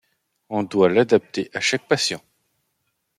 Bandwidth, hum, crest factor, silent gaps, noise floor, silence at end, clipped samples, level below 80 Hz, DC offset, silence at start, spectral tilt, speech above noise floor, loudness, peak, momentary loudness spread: 14 kHz; none; 20 dB; none; -74 dBFS; 1 s; under 0.1%; -68 dBFS; under 0.1%; 0.5 s; -4 dB/octave; 53 dB; -20 LUFS; -4 dBFS; 11 LU